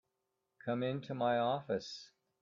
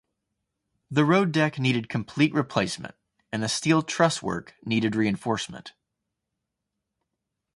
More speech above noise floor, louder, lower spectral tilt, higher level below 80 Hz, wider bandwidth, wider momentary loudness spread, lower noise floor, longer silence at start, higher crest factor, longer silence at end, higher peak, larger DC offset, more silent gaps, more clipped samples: second, 50 dB vs 59 dB; second, -37 LUFS vs -25 LUFS; about the same, -6 dB/octave vs -5 dB/octave; second, -78 dBFS vs -62 dBFS; second, 7.6 kHz vs 11.5 kHz; about the same, 14 LU vs 13 LU; about the same, -86 dBFS vs -83 dBFS; second, 0.65 s vs 0.9 s; second, 16 dB vs 22 dB; second, 0.35 s vs 1.85 s; second, -22 dBFS vs -6 dBFS; neither; neither; neither